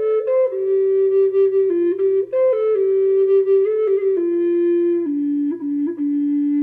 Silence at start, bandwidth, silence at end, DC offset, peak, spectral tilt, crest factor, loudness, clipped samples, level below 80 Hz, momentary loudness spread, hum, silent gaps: 0 s; 3.3 kHz; 0 s; under 0.1%; -8 dBFS; -9 dB/octave; 8 dB; -18 LUFS; under 0.1%; -76 dBFS; 5 LU; none; none